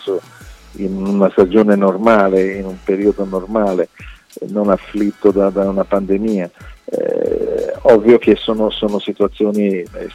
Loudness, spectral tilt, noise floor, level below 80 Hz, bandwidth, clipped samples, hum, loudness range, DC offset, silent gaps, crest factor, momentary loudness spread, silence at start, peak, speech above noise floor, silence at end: -15 LUFS; -7.5 dB/octave; -38 dBFS; -40 dBFS; 12.5 kHz; under 0.1%; none; 3 LU; under 0.1%; none; 14 dB; 12 LU; 0 s; 0 dBFS; 24 dB; 0 s